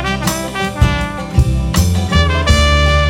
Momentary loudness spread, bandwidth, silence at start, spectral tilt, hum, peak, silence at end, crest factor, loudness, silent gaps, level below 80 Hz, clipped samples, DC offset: 7 LU; 17 kHz; 0 s; -5 dB/octave; none; 0 dBFS; 0 s; 12 dB; -14 LUFS; none; -18 dBFS; under 0.1%; under 0.1%